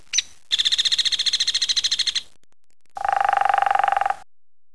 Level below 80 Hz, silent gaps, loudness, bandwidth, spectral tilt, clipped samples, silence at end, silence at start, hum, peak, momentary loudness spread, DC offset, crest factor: -60 dBFS; none; -20 LUFS; 11 kHz; 2.5 dB/octave; under 0.1%; 0.5 s; 0.15 s; none; -4 dBFS; 8 LU; 0.9%; 18 dB